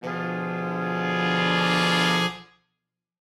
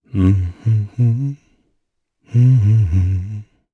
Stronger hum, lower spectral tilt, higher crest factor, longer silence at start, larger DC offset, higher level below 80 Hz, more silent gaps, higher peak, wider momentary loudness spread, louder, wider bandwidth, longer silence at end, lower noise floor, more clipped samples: neither; second, -4.5 dB/octave vs -10 dB/octave; about the same, 16 dB vs 12 dB; second, 0 s vs 0.15 s; neither; second, -62 dBFS vs -36 dBFS; neither; second, -8 dBFS vs -4 dBFS; second, 9 LU vs 14 LU; second, -23 LUFS vs -16 LUFS; first, 13.5 kHz vs 6.2 kHz; first, 0.95 s vs 0.3 s; first, -83 dBFS vs -70 dBFS; neither